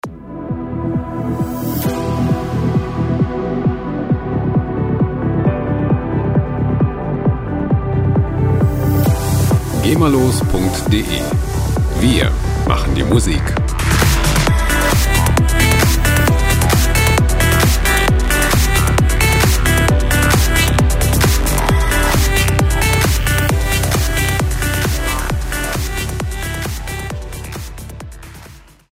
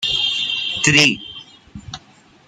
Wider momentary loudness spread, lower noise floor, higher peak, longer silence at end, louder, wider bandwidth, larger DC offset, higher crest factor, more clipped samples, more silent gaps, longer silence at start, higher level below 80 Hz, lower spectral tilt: second, 9 LU vs 24 LU; second, -39 dBFS vs -49 dBFS; about the same, 0 dBFS vs 0 dBFS; second, 0.35 s vs 0.5 s; about the same, -15 LUFS vs -15 LUFS; first, 16.5 kHz vs 13.5 kHz; neither; second, 14 dB vs 20 dB; neither; neither; about the same, 0.05 s vs 0 s; first, -20 dBFS vs -50 dBFS; first, -5 dB/octave vs -2 dB/octave